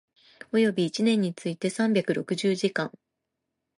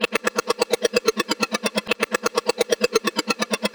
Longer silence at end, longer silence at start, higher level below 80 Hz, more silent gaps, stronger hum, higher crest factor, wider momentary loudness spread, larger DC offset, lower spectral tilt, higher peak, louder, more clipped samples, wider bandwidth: first, 0.9 s vs 0.05 s; first, 0.55 s vs 0 s; second, -76 dBFS vs -60 dBFS; neither; neither; about the same, 16 dB vs 20 dB; first, 6 LU vs 3 LU; neither; first, -5.5 dB/octave vs -2 dB/octave; second, -10 dBFS vs -4 dBFS; second, -26 LUFS vs -22 LUFS; neither; second, 11.5 kHz vs over 20 kHz